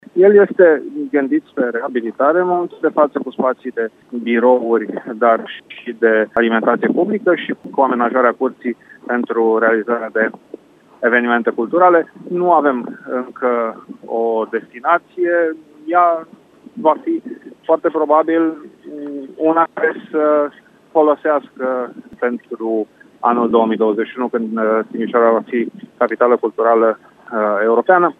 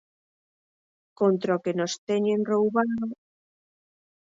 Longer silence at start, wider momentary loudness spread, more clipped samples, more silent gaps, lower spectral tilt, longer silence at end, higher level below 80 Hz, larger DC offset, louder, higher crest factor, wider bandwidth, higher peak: second, 0.15 s vs 1.2 s; first, 11 LU vs 8 LU; neither; second, none vs 1.98-2.07 s; first, -8 dB/octave vs -6 dB/octave; second, 0.05 s vs 1.2 s; about the same, -68 dBFS vs -72 dBFS; neither; first, -16 LUFS vs -26 LUFS; about the same, 16 dB vs 18 dB; second, 4 kHz vs 7.8 kHz; first, 0 dBFS vs -10 dBFS